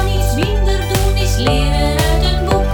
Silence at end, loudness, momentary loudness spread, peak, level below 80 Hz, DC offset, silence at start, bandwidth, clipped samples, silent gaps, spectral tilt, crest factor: 0 s; -15 LUFS; 2 LU; -2 dBFS; -16 dBFS; under 0.1%; 0 s; 19.5 kHz; under 0.1%; none; -5 dB/octave; 12 dB